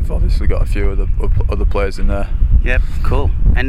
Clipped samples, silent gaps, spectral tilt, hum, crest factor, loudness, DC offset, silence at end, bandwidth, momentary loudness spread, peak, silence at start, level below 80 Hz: under 0.1%; none; -7.5 dB/octave; none; 12 dB; -18 LUFS; under 0.1%; 0 s; 5.6 kHz; 3 LU; 0 dBFS; 0 s; -14 dBFS